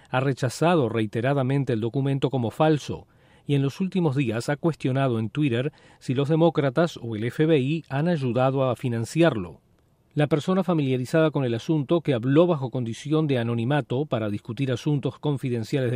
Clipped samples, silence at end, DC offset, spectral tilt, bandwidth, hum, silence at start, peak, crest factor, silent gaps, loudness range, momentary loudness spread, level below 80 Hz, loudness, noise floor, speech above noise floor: under 0.1%; 0 s; under 0.1%; -7.5 dB/octave; 14.5 kHz; none; 0.1 s; -8 dBFS; 16 dB; none; 2 LU; 7 LU; -62 dBFS; -24 LUFS; -62 dBFS; 38 dB